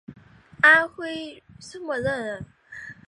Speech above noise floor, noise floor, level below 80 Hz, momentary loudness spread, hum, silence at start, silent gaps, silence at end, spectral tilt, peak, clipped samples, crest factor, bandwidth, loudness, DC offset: 19 dB; -42 dBFS; -58 dBFS; 25 LU; none; 0.1 s; none; 0.15 s; -4 dB/octave; -4 dBFS; under 0.1%; 22 dB; 11 kHz; -21 LUFS; under 0.1%